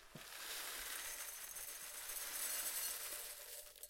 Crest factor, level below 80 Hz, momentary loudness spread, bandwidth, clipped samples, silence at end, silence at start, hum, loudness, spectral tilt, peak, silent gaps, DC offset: 18 dB; -72 dBFS; 9 LU; 17 kHz; under 0.1%; 0 s; 0 s; none; -44 LUFS; 1 dB/octave; -30 dBFS; none; under 0.1%